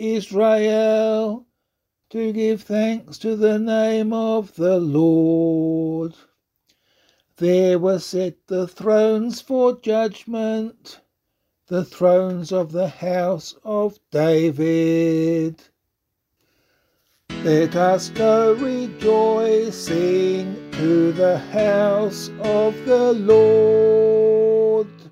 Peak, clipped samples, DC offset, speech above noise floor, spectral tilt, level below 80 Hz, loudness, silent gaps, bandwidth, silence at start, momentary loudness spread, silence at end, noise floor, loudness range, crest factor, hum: -4 dBFS; under 0.1%; under 0.1%; 59 dB; -6.5 dB/octave; -60 dBFS; -19 LUFS; none; 14 kHz; 0 s; 10 LU; 0.05 s; -77 dBFS; 6 LU; 16 dB; none